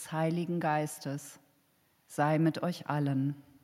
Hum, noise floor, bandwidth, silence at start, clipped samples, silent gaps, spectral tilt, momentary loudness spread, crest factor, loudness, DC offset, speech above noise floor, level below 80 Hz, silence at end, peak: none; -70 dBFS; 15.5 kHz; 0 s; under 0.1%; none; -6.5 dB/octave; 12 LU; 18 dB; -32 LUFS; under 0.1%; 39 dB; -80 dBFS; 0.25 s; -14 dBFS